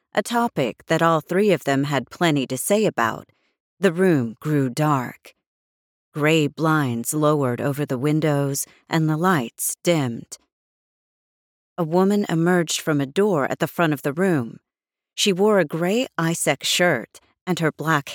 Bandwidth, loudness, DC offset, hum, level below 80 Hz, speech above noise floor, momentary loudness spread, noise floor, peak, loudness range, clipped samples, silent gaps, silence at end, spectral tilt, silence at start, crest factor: 19 kHz; -21 LUFS; under 0.1%; none; -70 dBFS; 67 dB; 7 LU; -88 dBFS; -4 dBFS; 3 LU; under 0.1%; 3.60-3.77 s, 5.47-6.12 s, 10.52-11.76 s, 17.41-17.46 s; 0 s; -5 dB/octave; 0.15 s; 18 dB